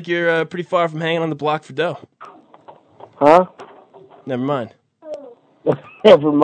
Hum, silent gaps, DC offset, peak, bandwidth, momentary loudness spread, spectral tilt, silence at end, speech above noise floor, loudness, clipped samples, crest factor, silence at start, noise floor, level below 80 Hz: none; none; under 0.1%; 0 dBFS; 9.2 kHz; 22 LU; -6.5 dB/octave; 0 s; 29 dB; -17 LUFS; 0.2%; 18 dB; 0 s; -46 dBFS; -66 dBFS